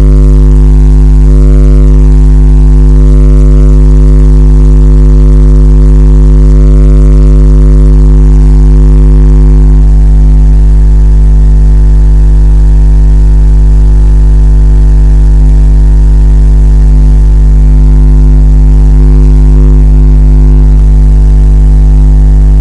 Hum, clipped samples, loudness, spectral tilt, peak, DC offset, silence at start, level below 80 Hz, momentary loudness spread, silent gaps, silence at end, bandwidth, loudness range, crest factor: 50 Hz at 0 dBFS; 0.5%; -5 LUFS; -9.5 dB/octave; 0 dBFS; 5%; 0 s; -2 dBFS; 1 LU; none; 0 s; 2.1 kHz; 1 LU; 2 dB